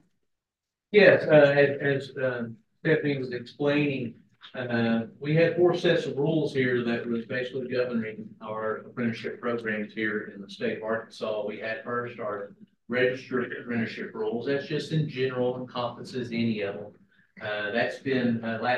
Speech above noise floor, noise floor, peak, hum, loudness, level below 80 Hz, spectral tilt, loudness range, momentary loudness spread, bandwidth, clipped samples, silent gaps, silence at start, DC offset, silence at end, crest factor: 61 dB; -88 dBFS; -4 dBFS; none; -27 LUFS; -72 dBFS; -7 dB/octave; 8 LU; 12 LU; 9.4 kHz; under 0.1%; none; 0.9 s; under 0.1%; 0 s; 22 dB